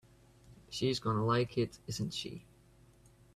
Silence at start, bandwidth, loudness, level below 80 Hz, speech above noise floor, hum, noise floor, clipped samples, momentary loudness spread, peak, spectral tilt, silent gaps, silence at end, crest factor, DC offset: 0.45 s; 13 kHz; -35 LUFS; -62 dBFS; 28 dB; none; -63 dBFS; under 0.1%; 13 LU; -18 dBFS; -5.5 dB/octave; none; 0.95 s; 18 dB; under 0.1%